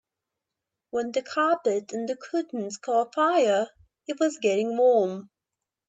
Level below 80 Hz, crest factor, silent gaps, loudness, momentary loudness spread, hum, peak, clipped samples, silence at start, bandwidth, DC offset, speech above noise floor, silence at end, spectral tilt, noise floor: -76 dBFS; 16 dB; none; -26 LUFS; 12 LU; none; -10 dBFS; under 0.1%; 0.95 s; 8.4 kHz; under 0.1%; 62 dB; 0.65 s; -4.5 dB/octave; -87 dBFS